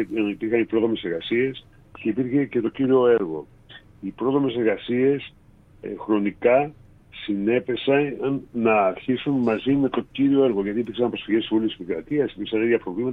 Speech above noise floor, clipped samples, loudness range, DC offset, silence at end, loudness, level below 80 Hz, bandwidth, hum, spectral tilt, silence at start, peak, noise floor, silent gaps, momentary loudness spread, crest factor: 26 dB; under 0.1%; 2 LU; under 0.1%; 0 s; -23 LUFS; -56 dBFS; 4.1 kHz; none; -9 dB/octave; 0 s; -6 dBFS; -48 dBFS; none; 11 LU; 16 dB